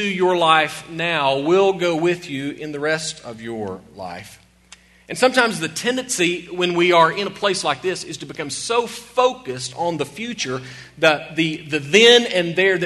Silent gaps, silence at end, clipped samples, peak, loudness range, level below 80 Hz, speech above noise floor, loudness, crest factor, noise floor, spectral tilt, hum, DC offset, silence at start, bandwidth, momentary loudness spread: none; 0 s; under 0.1%; 0 dBFS; 6 LU; -58 dBFS; 29 dB; -19 LUFS; 20 dB; -49 dBFS; -3.5 dB/octave; none; under 0.1%; 0 s; 12.5 kHz; 15 LU